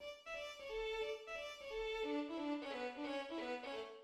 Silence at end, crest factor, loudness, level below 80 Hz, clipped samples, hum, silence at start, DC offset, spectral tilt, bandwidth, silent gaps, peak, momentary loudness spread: 0 s; 14 dB; -45 LUFS; -66 dBFS; under 0.1%; none; 0 s; under 0.1%; -3 dB/octave; 14.5 kHz; none; -32 dBFS; 5 LU